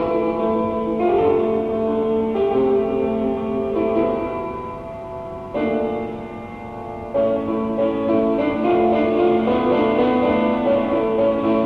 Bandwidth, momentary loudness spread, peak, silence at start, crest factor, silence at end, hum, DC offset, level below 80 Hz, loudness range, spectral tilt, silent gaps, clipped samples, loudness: 6 kHz; 14 LU; -6 dBFS; 0 s; 14 dB; 0 s; none; under 0.1%; -46 dBFS; 7 LU; -8.5 dB/octave; none; under 0.1%; -20 LUFS